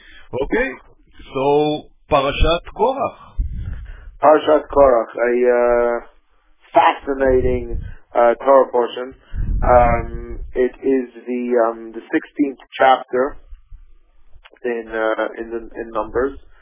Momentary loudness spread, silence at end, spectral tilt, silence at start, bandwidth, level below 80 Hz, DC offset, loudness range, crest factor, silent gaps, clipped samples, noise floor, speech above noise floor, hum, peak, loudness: 15 LU; 0.25 s; -10 dB/octave; 0.2 s; 3.8 kHz; -30 dBFS; under 0.1%; 5 LU; 18 dB; none; under 0.1%; -53 dBFS; 36 dB; none; 0 dBFS; -18 LUFS